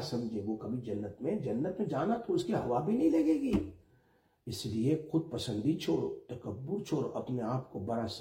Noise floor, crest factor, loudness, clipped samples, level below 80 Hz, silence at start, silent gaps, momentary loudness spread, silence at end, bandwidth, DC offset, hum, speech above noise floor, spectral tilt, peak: -70 dBFS; 16 dB; -34 LUFS; under 0.1%; -60 dBFS; 0 s; none; 10 LU; 0 s; 16.5 kHz; under 0.1%; none; 36 dB; -7 dB/octave; -18 dBFS